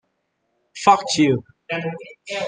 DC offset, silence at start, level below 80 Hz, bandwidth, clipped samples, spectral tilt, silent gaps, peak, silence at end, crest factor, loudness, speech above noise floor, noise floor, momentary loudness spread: under 0.1%; 0.75 s; -66 dBFS; 10 kHz; under 0.1%; -4.5 dB/octave; none; -2 dBFS; 0 s; 20 dB; -20 LUFS; 52 dB; -72 dBFS; 14 LU